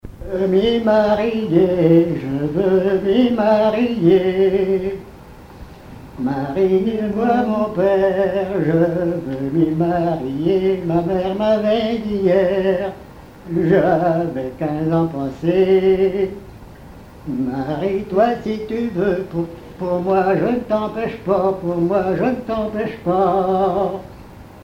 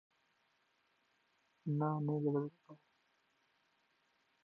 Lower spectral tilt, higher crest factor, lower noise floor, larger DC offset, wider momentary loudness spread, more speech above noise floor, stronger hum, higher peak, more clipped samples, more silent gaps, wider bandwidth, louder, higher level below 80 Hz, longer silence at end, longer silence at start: second, -8.5 dB/octave vs -11 dB/octave; about the same, 16 dB vs 20 dB; second, -39 dBFS vs -78 dBFS; neither; about the same, 9 LU vs 11 LU; second, 22 dB vs 41 dB; neither; first, -2 dBFS vs -24 dBFS; neither; neither; first, 7.2 kHz vs 4.5 kHz; first, -18 LUFS vs -39 LUFS; first, -44 dBFS vs under -90 dBFS; second, 0 s vs 1.7 s; second, 0.05 s vs 1.65 s